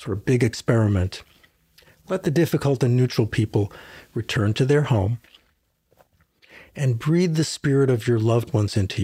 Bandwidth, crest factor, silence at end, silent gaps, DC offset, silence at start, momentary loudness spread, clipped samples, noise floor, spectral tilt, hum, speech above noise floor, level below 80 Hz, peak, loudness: 15.5 kHz; 18 dB; 0 s; none; under 0.1%; 0 s; 10 LU; under 0.1%; -67 dBFS; -6.5 dB/octave; none; 46 dB; -52 dBFS; -4 dBFS; -22 LUFS